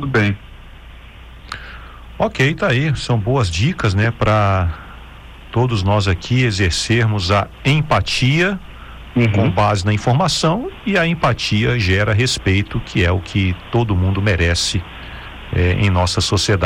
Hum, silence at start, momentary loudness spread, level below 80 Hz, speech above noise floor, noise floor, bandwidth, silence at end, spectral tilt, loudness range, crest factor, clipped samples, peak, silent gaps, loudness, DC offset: none; 0 s; 13 LU; -34 dBFS; 22 dB; -37 dBFS; 11 kHz; 0 s; -5.5 dB/octave; 2 LU; 12 dB; under 0.1%; -6 dBFS; none; -17 LUFS; under 0.1%